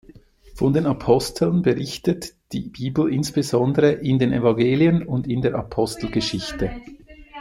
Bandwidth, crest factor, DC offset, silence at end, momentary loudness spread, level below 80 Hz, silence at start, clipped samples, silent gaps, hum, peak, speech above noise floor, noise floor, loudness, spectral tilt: 16 kHz; 18 dB; under 0.1%; 0 s; 10 LU; -44 dBFS; 0.45 s; under 0.1%; none; none; -2 dBFS; 28 dB; -48 dBFS; -21 LUFS; -6.5 dB/octave